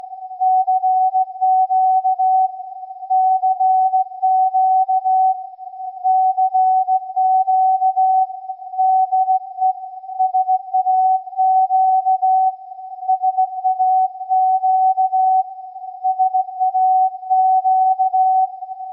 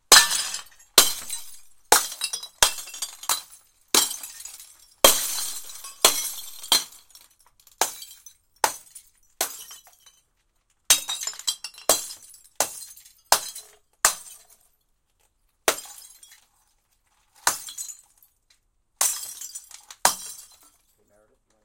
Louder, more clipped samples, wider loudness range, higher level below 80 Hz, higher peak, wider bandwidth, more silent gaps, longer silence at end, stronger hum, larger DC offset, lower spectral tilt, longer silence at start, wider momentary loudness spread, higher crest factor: first, -17 LUFS vs -22 LUFS; neither; second, 1 LU vs 9 LU; second, under -90 dBFS vs -56 dBFS; second, -8 dBFS vs 0 dBFS; second, 0.9 kHz vs 17 kHz; neither; second, 0 s vs 1.25 s; neither; neither; first, -0.5 dB/octave vs 1.5 dB/octave; about the same, 0.05 s vs 0.1 s; second, 10 LU vs 22 LU; second, 8 dB vs 28 dB